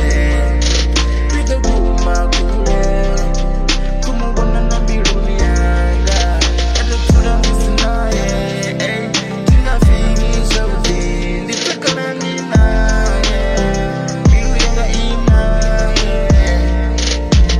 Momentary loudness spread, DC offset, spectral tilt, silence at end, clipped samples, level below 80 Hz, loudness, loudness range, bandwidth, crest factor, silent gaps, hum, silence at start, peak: 5 LU; under 0.1%; -5 dB/octave; 0 s; under 0.1%; -14 dBFS; -15 LUFS; 2 LU; 11 kHz; 12 dB; none; none; 0 s; 0 dBFS